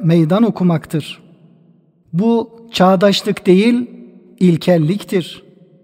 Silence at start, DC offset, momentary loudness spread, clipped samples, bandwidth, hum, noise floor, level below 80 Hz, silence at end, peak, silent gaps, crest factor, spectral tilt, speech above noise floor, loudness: 0 s; under 0.1%; 12 LU; under 0.1%; 15.5 kHz; none; -51 dBFS; -58 dBFS; 0.45 s; 0 dBFS; none; 16 dB; -7 dB/octave; 38 dB; -15 LUFS